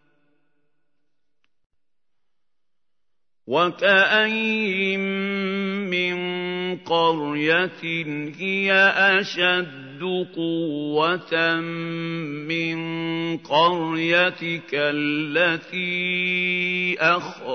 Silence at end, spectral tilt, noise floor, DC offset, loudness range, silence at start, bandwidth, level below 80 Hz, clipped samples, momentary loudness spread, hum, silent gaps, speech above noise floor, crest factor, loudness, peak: 0 s; -5.5 dB/octave; -86 dBFS; under 0.1%; 4 LU; 3.45 s; 6.6 kHz; -74 dBFS; under 0.1%; 10 LU; none; none; 64 dB; 20 dB; -21 LUFS; -4 dBFS